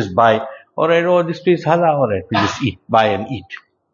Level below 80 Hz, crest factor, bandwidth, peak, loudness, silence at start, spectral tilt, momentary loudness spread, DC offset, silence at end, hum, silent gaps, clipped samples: -54 dBFS; 16 dB; 7.4 kHz; 0 dBFS; -16 LUFS; 0 s; -6 dB/octave; 14 LU; under 0.1%; 0.35 s; none; none; under 0.1%